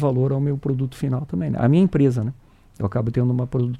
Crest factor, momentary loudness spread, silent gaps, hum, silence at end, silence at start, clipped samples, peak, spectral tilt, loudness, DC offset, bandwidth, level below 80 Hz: 16 dB; 9 LU; none; none; 0 s; 0 s; under 0.1%; -6 dBFS; -9.5 dB/octave; -21 LUFS; under 0.1%; 9.8 kHz; -46 dBFS